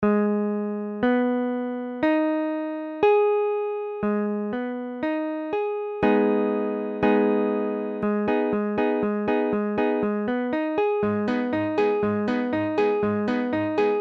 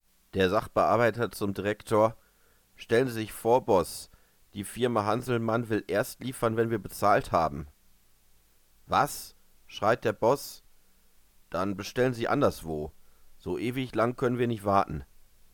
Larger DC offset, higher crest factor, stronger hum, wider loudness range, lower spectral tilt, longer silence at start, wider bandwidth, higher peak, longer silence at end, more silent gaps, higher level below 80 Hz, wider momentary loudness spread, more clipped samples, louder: neither; second, 14 dB vs 20 dB; neither; about the same, 2 LU vs 3 LU; first, -8.5 dB/octave vs -5.5 dB/octave; second, 0 s vs 0.35 s; second, 6.2 kHz vs 19 kHz; about the same, -8 dBFS vs -8 dBFS; second, 0 s vs 0.5 s; neither; about the same, -58 dBFS vs -54 dBFS; second, 7 LU vs 15 LU; neither; first, -24 LUFS vs -28 LUFS